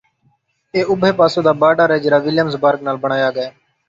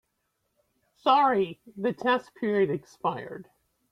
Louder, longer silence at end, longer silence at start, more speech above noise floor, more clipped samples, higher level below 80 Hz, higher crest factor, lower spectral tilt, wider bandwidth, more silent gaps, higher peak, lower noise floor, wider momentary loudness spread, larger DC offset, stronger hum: first, -15 LUFS vs -27 LUFS; about the same, 0.4 s vs 0.5 s; second, 0.75 s vs 1.05 s; second, 46 dB vs 51 dB; neither; first, -58 dBFS vs -72 dBFS; about the same, 14 dB vs 18 dB; about the same, -6.5 dB/octave vs -6.5 dB/octave; second, 7.8 kHz vs 10.5 kHz; neither; first, -2 dBFS vs -10 dBFS; second, -61 dBFS vs -77 dBFS; second, 7 LU vs 13 LU; neither; neither